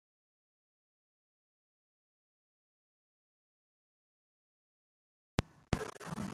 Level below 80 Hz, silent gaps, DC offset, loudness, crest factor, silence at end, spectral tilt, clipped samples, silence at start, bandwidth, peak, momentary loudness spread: -60 dBFS; none; under 0.1%; -40 LUFS; 34 dB; 0 s; -5.5 dB/octave; under 0.1%; 5.4 s; 13.5 kHz; -14 dBFS; 4 LU